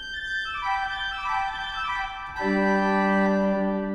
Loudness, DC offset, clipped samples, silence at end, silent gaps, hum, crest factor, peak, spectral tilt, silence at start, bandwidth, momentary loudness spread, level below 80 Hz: -25 LUFS; under 0.1%; under 0.1%; 0 s; none; none; 14 dB; -12 dBFS; -6 dB/octave; 0 s; 8.4 kHz; 7 LU; -48 dBFS